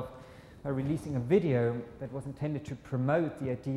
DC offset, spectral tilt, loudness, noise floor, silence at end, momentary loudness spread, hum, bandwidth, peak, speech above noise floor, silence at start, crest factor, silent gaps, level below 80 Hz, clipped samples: under 0.1%; -8.5 dB/octave; -32 LUFS; -51 dBFS; 0 s; 14 LU; none; 12 kHz; -14 dBFS; 20 dB; 0 s; 18 dB; none; -58 dBFS; under 0.1%